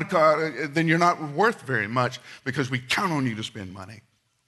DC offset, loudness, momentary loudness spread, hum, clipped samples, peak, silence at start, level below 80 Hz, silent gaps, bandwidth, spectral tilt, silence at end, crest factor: under 0.1%; -24 LUFS; 15 LU; none; under 0.1%; -6 dBFS; 0 s; -66 dBFS; none; 12 kHz; -5.5 dB/octave; 0.5 s; 18 dB